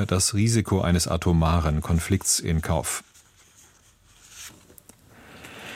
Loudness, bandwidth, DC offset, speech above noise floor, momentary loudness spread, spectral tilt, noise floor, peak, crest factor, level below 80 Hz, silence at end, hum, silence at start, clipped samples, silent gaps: -23 LUFS; 16 kHz; under 0.1%; 34 dB; 20 LU; -4.5 dB/octave; -57 dBFS; -8 dBFS; 18 dB; -36 dBFS; 0 s; none; 0 s; under 0.1%; none